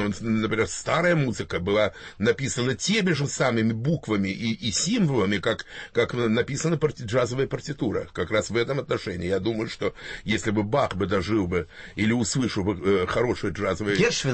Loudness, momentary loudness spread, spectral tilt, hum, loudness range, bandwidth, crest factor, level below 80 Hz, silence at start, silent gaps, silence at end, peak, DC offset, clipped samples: -25 LUFS; 6 LU; -5 dB/octave; none; 2 LU; 8.8 kHz; 16 dB; -50 dBFS; 0 s; none; 0 s; -8 dBFS; under 0.1%; under 0.1%